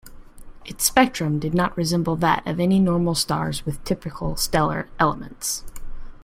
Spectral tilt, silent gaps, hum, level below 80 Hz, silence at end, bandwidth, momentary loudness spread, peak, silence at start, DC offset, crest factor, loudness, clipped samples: -4.5 dB/octave; none; none; -38 dBFS; 0 s; 16.5 kHz; 10 LU; 0 dBFS; 0.05 s; under 0.1%; 22 dB; -22 LUFS; under 0.1%